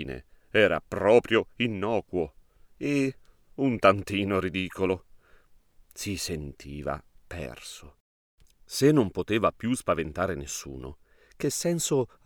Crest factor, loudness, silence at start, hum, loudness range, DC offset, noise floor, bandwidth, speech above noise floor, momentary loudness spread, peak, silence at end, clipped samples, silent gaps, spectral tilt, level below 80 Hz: 22 dB; -27 LUFS; 0 s; none; 10 LU; under 0.1%; -57 dBFS; 20 kHz; 31 dB; 18 LU; -6 dBFS; 0.2 s; under 0.1%; 8.00-8.38 s; -5 dB/octave; -52 dBFS